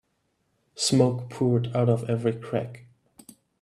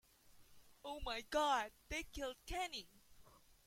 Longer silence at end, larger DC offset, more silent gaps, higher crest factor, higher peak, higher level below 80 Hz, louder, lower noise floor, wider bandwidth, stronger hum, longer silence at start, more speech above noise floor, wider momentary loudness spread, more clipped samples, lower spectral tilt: first, 0.8 s vs 0.35 s; neither; neither; about the same, 20 dB vs 20 dB; first, -6 dBFS vs -24 dBFS; second, -64 dBFS vs -58 dBFS; first, -25 LUFS vs -43 LUFS; first, -73 dBFS vs -66 dBFS; second, 13 kHz vs 16.5 kHz; neither; first, 0.75 s vs 0.3 s; first, 49 dB vs 24 dB; second, 9 LU vs 14 LU; neither; first, -6 dB/octave vs -2.5 dB/octave